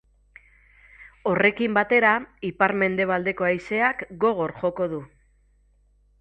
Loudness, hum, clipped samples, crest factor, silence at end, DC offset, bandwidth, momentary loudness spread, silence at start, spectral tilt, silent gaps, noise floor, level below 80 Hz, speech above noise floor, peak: -23 LUFS; 50 Hz at -55 dBFS; under 0.1%; 22 dB; 1.15 s; under 0.1%; 8.4 kHz; 10 LU; 1 s; -7.5 dB/octave; none; -61 dBFS; -58 dBFS; 38 dB; -4 dBFS